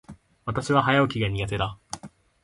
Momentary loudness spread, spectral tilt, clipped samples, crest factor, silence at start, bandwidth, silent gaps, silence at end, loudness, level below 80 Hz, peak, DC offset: 18 LU; -5.5 dB/octave; under 0.1%; 20 dB; 0.1 s; 11.5 kHz; none; 0.35 s; -24 LUFS; -46 dBFS; -6 dBFS; under 0.1%